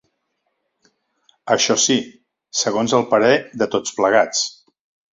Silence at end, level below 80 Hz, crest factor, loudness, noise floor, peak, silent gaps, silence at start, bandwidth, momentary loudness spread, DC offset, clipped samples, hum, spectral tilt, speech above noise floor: 0.6 s; -62 dBFS; 18 dB; -18 LUFS; -72 dBFS; -2 dBFS; none; 1.45 s; 8 kHz; 10 LU; under 0.1%; under 0.1%; none; -2.5 dB/octave; 55 dB